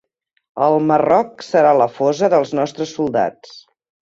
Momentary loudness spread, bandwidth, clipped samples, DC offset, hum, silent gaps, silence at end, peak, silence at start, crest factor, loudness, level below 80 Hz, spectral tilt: 9 LU; 7.8 kHz; under 0.1%; under 0.1%; none; none; 0.55 s; -2 dBFS; 0.55 s; 16 dB; -16 LUFS; -60 dBFS; -6 dB/octave